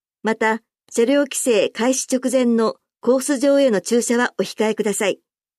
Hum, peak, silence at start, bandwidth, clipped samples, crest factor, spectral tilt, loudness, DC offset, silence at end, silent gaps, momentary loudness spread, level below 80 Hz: none; -6 dBFS; 0.25 s; 15 kHz; under 0.1%; 12 dB; -3.5 dB/octave; -19 LUFS; under 0.1%; 0.45 s; none; 6 LU; -74 dBFS